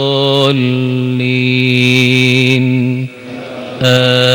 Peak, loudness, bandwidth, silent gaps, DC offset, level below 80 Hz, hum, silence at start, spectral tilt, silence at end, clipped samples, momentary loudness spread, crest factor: 0 dBFS; -11 LUFS; 16.5 kHz; none; under 0.1%; -54 dBFS; none; 0 s; -5.5 dB/octave; 0 s; 0.4%; 15 LU; 12 dB